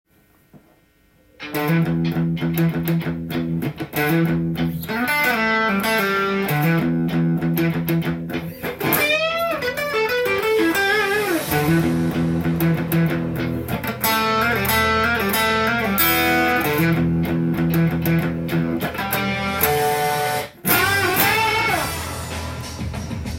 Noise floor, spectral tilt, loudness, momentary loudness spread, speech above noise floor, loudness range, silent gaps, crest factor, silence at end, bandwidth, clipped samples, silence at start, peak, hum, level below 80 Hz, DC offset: -57 dBFS; -5 dB/octave; -20 LUFS; 8 LU; 37 dB; 3 LU; none; 20 dB; 0 s; 17 kHz; under 0.1%; 0.55 s; 0 dBFS; none; -44 dBFS; under 0.1%